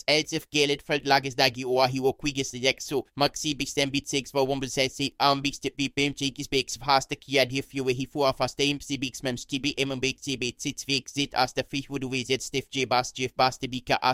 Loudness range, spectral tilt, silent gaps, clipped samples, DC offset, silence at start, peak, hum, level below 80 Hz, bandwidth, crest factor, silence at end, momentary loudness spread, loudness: 3 LU; -3.5 dB/octave; none; under 0.1%; under 0.1%; 0.1 s; -2 dBFS; none; -52 dBFS; 16 kHz; 24 dB; 0 s; 7 LU; -26 LUFS